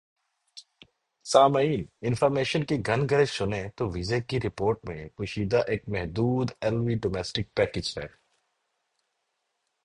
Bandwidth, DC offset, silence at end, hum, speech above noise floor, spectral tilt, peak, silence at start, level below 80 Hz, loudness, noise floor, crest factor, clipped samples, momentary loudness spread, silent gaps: 11.5 kHz; under 0.1%; 1.8 s; none; 52 dB; -6 dB/octave; -4 dBFS; 0.55 s; -50 dBFS; -27 LUFS; -78 dBFS; 24 dB; under 0.1%; 11 LU; none